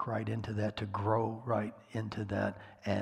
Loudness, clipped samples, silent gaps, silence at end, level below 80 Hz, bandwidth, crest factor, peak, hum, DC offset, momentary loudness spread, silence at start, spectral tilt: -36 LUFS; under 0.1%; none; 0 s; -64 dBFS; 9.8 kHz; 20 dB; -16 dBFS; none; under 0.1%; 7 LU; 0 s; -7.5 dB/octave